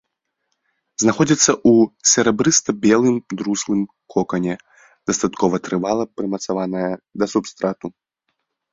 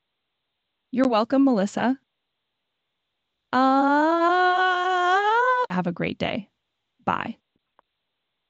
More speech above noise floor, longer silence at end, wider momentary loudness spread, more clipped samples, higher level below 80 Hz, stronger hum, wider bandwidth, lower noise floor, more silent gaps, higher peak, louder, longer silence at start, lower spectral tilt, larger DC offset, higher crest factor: about the same, 56 dB vs 58 dB; second, 0.85 s vs 1.15 s; about the same, 11 LU vs 10 LU; neither; first, -56 dBFS vs -66 dBFS; neither; about the same, 7.8 kHz vs 8.2 kHz; second, -74 dBFS vs -80 dBFS; neither; first, 0 dBFS vs -8 dBFS; first, -18 LUFS vs -22 LUFS; about the same, 1 s vs 0.95 s; second, -4 dB/octave vs -5.5 dB/octave; neither; about the same, 18 dB vs 16 dB